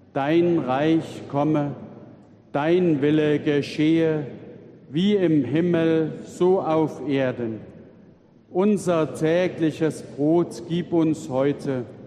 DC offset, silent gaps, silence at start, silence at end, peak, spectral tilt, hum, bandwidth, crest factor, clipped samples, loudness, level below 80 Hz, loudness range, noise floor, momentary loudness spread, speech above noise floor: under 0.1%; none; 0.15 s; 0 s; -8 dBFS; -7.5 dB/octave; none; 11 kHz; 14 dB; under 0.1%; -22 LUFS; -66 dBFS; 2 LU; -52 dBFS; 10 LU; 30 dB